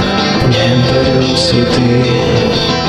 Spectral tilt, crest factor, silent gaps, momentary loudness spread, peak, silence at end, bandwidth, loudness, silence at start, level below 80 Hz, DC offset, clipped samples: -5.5 dB/octave; 10 dB; none; 1 LU; 0 dBFS; 0 s; 11 kHz; -11 LUFS; 0 s; -30 dBFS; under 0.1%; under 0.1%